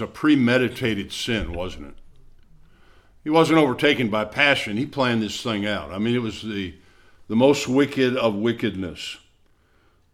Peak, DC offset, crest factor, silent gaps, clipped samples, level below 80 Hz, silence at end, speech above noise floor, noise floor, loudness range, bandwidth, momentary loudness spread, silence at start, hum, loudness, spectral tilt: -2 dBFS; under 0.1%; 20 dB; none; under 0.1%; -46 dBFS; 0.95 s; 38 dB; -60 dBFS; 3 LU; 15 kHz; 13 LU; 0 s; none; -22 LUFS; -5 dB/octave